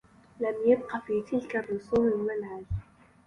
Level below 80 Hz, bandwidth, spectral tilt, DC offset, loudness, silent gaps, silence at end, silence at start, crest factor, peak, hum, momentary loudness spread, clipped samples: -50 dBFS; 10 kHz; -8.5 dB/octave; under 0.1%; -30 LUFS; none; 0.45 s; 0.4 s; 18 dB; -12 dBFS; none; 11 LU; under 0.1%